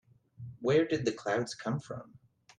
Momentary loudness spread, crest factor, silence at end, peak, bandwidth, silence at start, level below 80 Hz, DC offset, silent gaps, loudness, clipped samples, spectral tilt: 18 LU; 18 dB; 0.4 s; -16 dBFS; 10.5 kHz; 0.4 s; -70 dBFS; under 0.1%; none; -32 LUFS; under 0.1%; -6 dB/octave